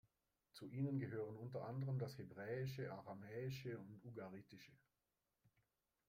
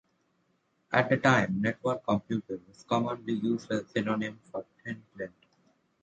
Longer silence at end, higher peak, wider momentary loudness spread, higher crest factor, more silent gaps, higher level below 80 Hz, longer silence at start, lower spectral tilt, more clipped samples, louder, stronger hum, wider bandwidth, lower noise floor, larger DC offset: second, 0.6 s vs 0.75 s; second, -32 dBFS vs -10 dBFS; second, 14 LU vs 17 LU; about the same, 18 dB vs 22 dB; neither; second, -82 dBFS vs -66 dBFS; second, 0.55 s vs 0.9 s; about the same, -7.5 dB/octave vs -6.5 dB/octave; neither; second, -49 LUFS vs -29 LUFS; neither; first, 16 kHz vs 9 kHz; first, under -90 dBFS vs -73 dBFS; neither